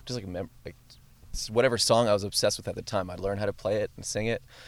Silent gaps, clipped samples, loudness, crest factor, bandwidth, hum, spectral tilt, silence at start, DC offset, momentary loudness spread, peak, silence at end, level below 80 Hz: none; under 0.1%; -28 LUFS; 20 dB; 16.5 kHz; none; -3.5 dB/octave; 0.05 s; under 0.1%; 15 LU; -10 dBFS; 0 s; -50 dBFS